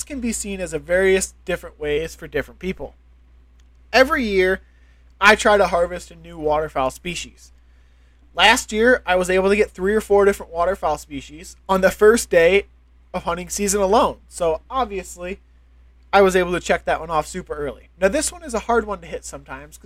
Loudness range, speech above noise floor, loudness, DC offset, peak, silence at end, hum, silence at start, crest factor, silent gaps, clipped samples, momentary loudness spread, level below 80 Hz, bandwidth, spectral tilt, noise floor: 5 LU; 31 dB; -19 LUFS; under 0.1%; 0 dBFS; 0.1 s; none; 0 s; 20 dB; none; under 0.1%; 17 LU; -40 dBFS; 16 kHz; -3.5 dB/octave; -51 dBFS